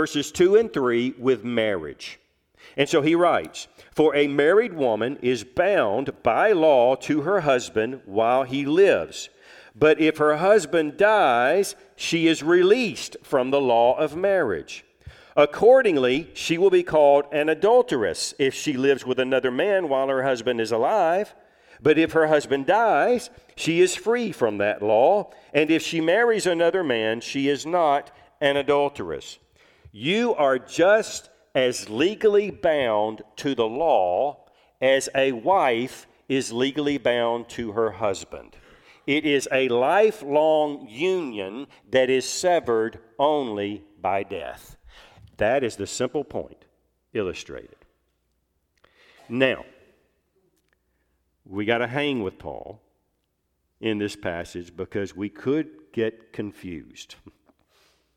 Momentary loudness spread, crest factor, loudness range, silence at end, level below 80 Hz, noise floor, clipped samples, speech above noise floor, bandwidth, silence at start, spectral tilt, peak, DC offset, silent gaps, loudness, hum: 15 LU; 20 dB; 10 LU; 0.85 s; -60 dBFS; -74 dBFS; under 0.1%; 52 dB; 15.5 kHz; 0 s; -4.5 dB/octave; -4 dBFS; under 0.1%; none; -22 LUFS; none